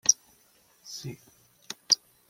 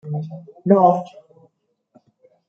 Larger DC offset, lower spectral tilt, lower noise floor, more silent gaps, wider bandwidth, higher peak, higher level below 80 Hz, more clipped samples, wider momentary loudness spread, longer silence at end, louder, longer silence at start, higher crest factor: neither; second, 0.5 dB/octave vs -10.5 dB/octave; about the same, -63 dBFS vs -64 dBFS; neither; first, 16.5 kHz vs 6.8 kHz; about the same, -4 dBFS vs -2 dBFS; about the same, -72 dBFS vs -70 dBFS; neither; first, 23 LU vs 20 LU; second, 0.35 s vs 1.45 s; second, -27 LUFS vs -18 LUFS; about the same, 0.05 s vs 0.05 s; first, 28 dB vs 20 dB